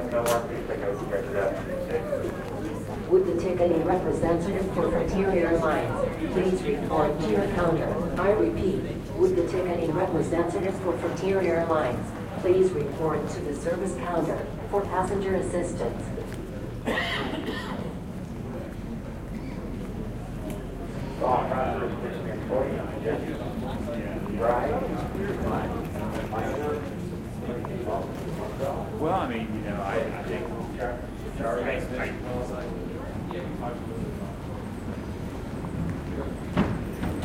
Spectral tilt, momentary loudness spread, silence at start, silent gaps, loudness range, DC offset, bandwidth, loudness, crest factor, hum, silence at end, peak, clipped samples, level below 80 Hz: -7 dB/octave; 11 LU; 0 s; none; 7 LU; under 0.1%; 16.5 kHz; -28 LUFS; 18 dB; none; 0 s; -8 dBFS; under 0.1%; -42 dBFS